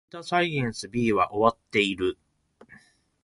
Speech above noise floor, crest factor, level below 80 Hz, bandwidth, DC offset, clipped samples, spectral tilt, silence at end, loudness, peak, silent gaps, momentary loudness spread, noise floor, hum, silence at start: 32 dB; 22 dB; -58 dBFS; 11.5 kHz; under 0.1%; under 0.1%; -5 dB/octave; 0.5 s; -25 LUFS; -4 dBFS; none; 7 LU; -57 dBFS; none; 0.15 s